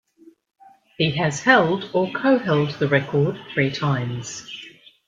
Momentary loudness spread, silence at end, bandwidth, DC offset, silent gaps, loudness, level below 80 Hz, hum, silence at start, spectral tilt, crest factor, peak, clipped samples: 15 LU; 0.4 s; 9.2 kHz; under 0.1%; none; -21 LUFS; -60 dBFS; none; 1 s; -5.5 dB/octave; 20 dB; -2 dBFS; under 0.1%